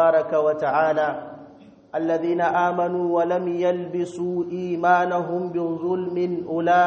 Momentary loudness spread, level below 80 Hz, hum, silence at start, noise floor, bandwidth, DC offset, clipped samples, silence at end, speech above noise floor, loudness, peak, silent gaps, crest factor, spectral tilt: 7 LU; -66 dBFS; none; 0 s; -47 dBFS; 8.2 kHz; under 0.1%; under 0.1%; 0 s; 25 dB; -23 LUFS; -4 dBFS; none; 16 dB; -7 dB/octave